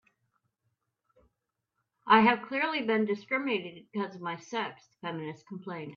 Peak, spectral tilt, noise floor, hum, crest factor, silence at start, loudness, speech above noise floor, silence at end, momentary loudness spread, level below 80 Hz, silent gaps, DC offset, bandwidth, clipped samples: -8 dBFS; -6 dB/octave; -84 dBFS; none; 24 dB; 2.05 s; -29 LUFS; 54 dB; 0 s; 19 LU; -76 dBFS; none; under 0.1%; 7.2 kHz; under 0.1%